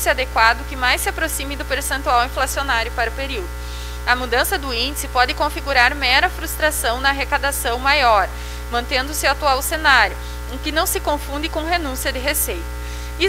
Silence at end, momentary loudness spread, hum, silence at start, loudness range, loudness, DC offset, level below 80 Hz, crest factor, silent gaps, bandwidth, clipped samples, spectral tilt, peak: 0 s; 11 LU; 60 Hz at -30 dBFS; 0 s; 3 LU; -18 LUFS; under 0.1%; -28 dBFS; 20 dB; none; 16 kHz; under 0.1%; -2.5 dB/octave; 0 dBFS